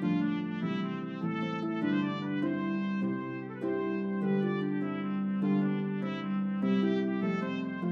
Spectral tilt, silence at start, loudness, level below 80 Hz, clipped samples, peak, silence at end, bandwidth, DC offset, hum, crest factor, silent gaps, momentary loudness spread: -9 dB/octave; 0 s; -32 LUFS; -80 dBFS; under 0.1%; -18 dBFS; 0 s; 6 kHz; under 0.1%; none; 12 dB; none; 5 LU